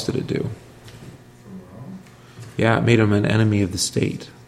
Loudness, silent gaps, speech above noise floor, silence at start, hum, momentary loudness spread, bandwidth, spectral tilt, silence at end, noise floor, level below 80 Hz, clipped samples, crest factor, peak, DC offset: -20 LUFS; none; 23 dB; 0 s; none; 25 LU; 14 kHz; -5.5 dB/octave; 0.2 s; -42 dBFS; -50 dBFS; under 0.1%; 20 dB; -2 dBFS; under 0.1%